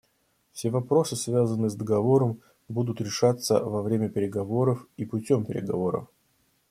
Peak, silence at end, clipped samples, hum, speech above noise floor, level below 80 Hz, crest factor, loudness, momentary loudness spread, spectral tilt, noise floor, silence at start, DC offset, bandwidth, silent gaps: -8 dBFS; 0.65 s; under 0.1%; none; 44 dB; -64 dBFS; 18 dB; -26 LUFS; 10 LU; -6.5 dB/octave; -70 dBFS; 0.55 s; under 0.1%; 15.5 kHz; none